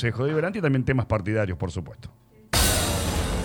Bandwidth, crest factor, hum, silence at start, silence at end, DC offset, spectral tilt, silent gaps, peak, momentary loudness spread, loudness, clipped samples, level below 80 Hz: 19.5 kHz; 16 dB; none; 0 s; 0 s; under 0.1%; -4.5 dB/octave; none; -8 dBFS; 10 LU; -24 LUFS; under 0.1%; -34 dBFS